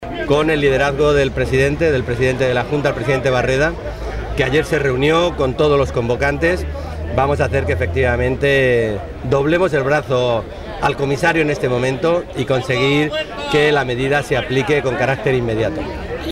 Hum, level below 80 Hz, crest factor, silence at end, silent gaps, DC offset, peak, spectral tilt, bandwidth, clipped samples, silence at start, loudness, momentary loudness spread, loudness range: none; -32 dBFS; 12 dB; 0 s; none; under 0.1%; -6 dBFS; -6 dB/octave; 14.5 kHz; under 0.1%; 0 s; -17 LUFS; 7 LU; 1 LU